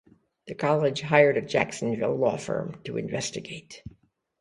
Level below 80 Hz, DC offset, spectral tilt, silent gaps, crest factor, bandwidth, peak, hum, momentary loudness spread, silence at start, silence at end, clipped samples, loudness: -60 dBFS; under 0.1%; -5 dB/octave; none; 24 dB; 11.5 kHz; -4 dBFS; none; 20 LU; 0.45 s; 0.5 s; under 0.1%; -26 LUFS